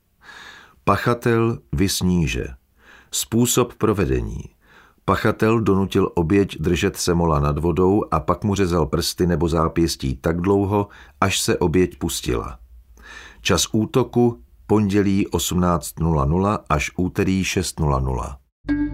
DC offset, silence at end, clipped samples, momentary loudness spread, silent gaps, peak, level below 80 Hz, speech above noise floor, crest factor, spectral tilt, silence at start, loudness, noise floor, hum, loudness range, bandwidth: under 0.1%; 0 s; under 0.1%; 8 LU; 18.52-18.64 s; -2 dBFS; -34 dBFS; 33 dB; 18 dB; -5.5 dB/octave; 0.3 s; -20 LUFS; -52 dBFS; none; 3 LU; 16 kHz